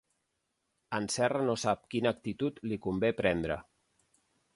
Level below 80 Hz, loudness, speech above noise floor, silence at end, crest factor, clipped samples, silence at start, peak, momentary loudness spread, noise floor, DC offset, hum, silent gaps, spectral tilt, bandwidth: -58 dBFS; -32 LUFS; 50 dB; 0.95 s; 20 dB; under 0.1%; 0.9 s; -14 dBFS; 7 LU; -81 dBFS; under 0.1%; none; none; -5 dB/octave; 11.5 kHz